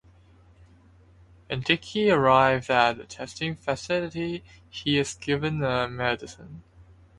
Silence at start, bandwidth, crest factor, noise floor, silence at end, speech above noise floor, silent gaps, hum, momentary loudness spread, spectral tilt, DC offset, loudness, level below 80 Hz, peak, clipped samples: 1.5 s; 11.5 kHz; 22 dB; -55 dBFS; 0.35 s; 30 dB; none; none; 18 LU; -5 dB/octave; under 0.1%; -25 LUFS; -54 dBFS; -4 dBFS; under 0.1%